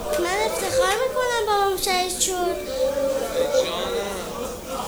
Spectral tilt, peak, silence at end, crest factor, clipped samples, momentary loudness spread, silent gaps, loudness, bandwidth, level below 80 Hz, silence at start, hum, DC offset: -2 dB/octave; -6 dBFS; 0 s; 16 dB; under 0.1%; 7 LU; none; -23 LUFS; over 20 kHz; -44 dBFS; 0 s; none; under 0.1%